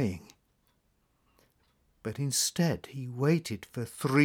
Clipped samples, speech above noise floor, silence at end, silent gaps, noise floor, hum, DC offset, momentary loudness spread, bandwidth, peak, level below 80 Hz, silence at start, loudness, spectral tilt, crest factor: under 0.1%; 43 dB; 0 s; none; -72 dBFS; none; under 0.1%; 12 LU; 19 kHz; -12 dBFS; -68 dBFS; 0 s; -31 LUFS; -4.5 dB/octave; 20 dB